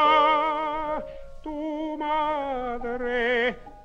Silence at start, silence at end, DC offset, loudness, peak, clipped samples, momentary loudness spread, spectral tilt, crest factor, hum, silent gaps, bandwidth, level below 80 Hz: 0 s; 0 s; under 0.1%; -26 LUFS; -8 dBFS; under 0.1%; 13 LU; -5 dB/octave; 16 dB; none; none; 8.2 kHz; -46 dBFS